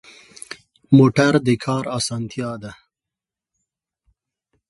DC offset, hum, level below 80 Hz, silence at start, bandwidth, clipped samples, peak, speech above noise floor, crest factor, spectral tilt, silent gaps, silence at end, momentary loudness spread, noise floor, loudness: under 0.1%; none; -56 dBFS; 0.5 s; 11.5 kHz; under 0.1%; 0 dBFS; 70 dB; 20 dB; -6 dB/octave; none; 1.95 s; 23 LU; -87 dBFS; -18 LUFS